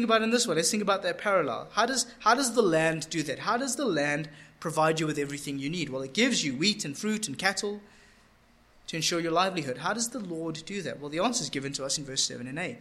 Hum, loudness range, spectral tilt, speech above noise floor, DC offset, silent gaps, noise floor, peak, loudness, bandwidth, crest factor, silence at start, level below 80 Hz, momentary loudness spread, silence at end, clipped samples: none; 4 LU; -3 dB/octave; 32 dB; under 0.1%; none; -61 dBFS; -8 dBFS; -28 LUFS; 15.5 kHz; 20 dB; 0 s; -64 dBFS; 10 LU; 0 s; under 0.1%